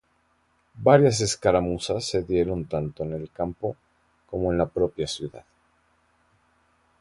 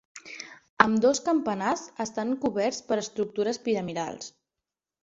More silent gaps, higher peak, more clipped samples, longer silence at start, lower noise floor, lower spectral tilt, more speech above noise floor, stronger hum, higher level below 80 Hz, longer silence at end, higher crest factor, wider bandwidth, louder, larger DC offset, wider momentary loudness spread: second, none vs 0.69-0.77 s; about the same, -4 dBFS vs -2 dBFS; neither; first, 0.75 s vs 0.15 s; second, -67 dBFS vs -89 dBFS; first, -5.5 dB/octave vs -4 dB/octave; second, 43 dB vs 61 dB; neither; first, -48 dBFS vs -66 dBFS; first, 1.6 s vs 0.75 s; about the same, 22 dB vs 26 dB; first, 11.5 kHz vs 8 kHz; about the same, -25 LUFS vs -27 LUFS; neither; second, 15 LU vs 18 LU